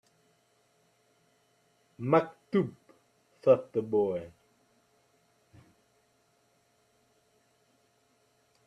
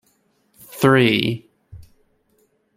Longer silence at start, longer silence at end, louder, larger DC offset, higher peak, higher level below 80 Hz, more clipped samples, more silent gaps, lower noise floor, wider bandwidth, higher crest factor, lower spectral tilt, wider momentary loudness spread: first, 2 s vs 0.75 s; first, 4.4 s vs 1 s; second, -29 LUFS vs -17 LUFS; neither; second, -10 dBFS vs -2 dBFS; second, -76 dBFS vs -56 dBFS; neither; neither; first, -70 dBFS vs -63 dBFS; second, 9.4 kHz vs 16.5 kHz; about the same, 24 dB vs 20 dB; first, -8.5 dB/octave vs -6 dB/octave; second, 13 LU vs 19 LU